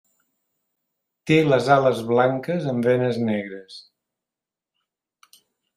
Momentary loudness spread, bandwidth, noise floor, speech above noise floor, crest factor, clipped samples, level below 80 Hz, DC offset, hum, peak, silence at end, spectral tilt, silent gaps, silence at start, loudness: 14 LU; 13.5 kHz; -89 dBFS; 68 dB; 20 dB; under 0.1%; -66 dBFS; under 0.1%; none; -4 dBFS; 1.95 s; -7 dB/octave; none; 1.25 s; -20 LUFS